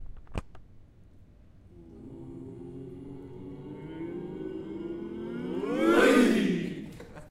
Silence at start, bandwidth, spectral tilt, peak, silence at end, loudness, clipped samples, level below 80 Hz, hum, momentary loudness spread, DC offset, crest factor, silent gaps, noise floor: 0 s; 16 kHz; -5.5 dB/octave; -10 dBFS; 0 s; -28 LUFS; under 0.1%; -52 dBFS; none; 22 LU; under 0.1%; 22 dB; none; -54 dBFS